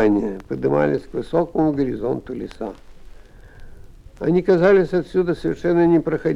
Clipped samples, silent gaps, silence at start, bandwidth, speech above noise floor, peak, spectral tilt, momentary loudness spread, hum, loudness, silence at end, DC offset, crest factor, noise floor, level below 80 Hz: under 0.1%; none; 0 s; 10 kHz; 22 dB; -4 dBFS; -8.5 dB/octave; 12 LU; none; -20 LUFS; 0 s; under 0.1%; 16 dB; -41 dBFS; -42 dBFS